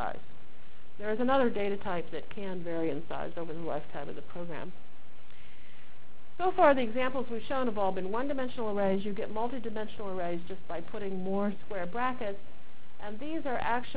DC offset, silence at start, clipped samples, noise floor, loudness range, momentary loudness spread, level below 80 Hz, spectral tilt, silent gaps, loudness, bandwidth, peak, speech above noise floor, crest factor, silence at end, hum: 4%; 0 s; under 0.1%; -58 dBFS; 9 LU; 14 LU; -60 dBFS; -9.5 dB/octave; none; -33 LUFS; 4 kHz; -12 dBFS; 25 dB; 24 dB; 0 s; none